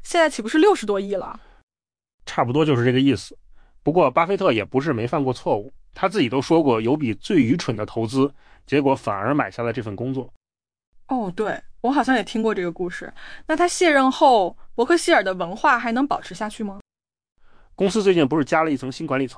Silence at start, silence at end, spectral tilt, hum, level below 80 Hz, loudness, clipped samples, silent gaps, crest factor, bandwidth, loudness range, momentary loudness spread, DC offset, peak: 0 s; 0 s; -5.5 dB/octave; none; -50 dBFS; -21 LUFS; under 0.1%; 1.63-1.68 s, 2.14-2.18 s, 10.36-10.41 s, 10.87-10.93 s, 16.81-16.85 s; 16 dB; 10.5 kHz; 6 LU; 12 LU; under 0.1%; -6 dBFS